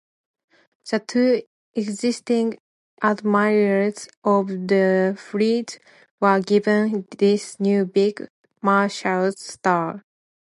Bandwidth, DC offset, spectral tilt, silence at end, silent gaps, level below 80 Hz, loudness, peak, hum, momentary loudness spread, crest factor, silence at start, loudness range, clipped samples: 11.5 kHz; under 0.1%; -6 dB/octave; 0.5 s; 1.47-1.74 s, 2.60-2.97 s, 4.17-4.22 s, 6.11-6.18 s, 8.30-8.44 s; -74 dBFS; -21 LUFS; -4 dBFS; none; 10 LU; 18 dB; 0.85 s; 2 LU; under 0.1%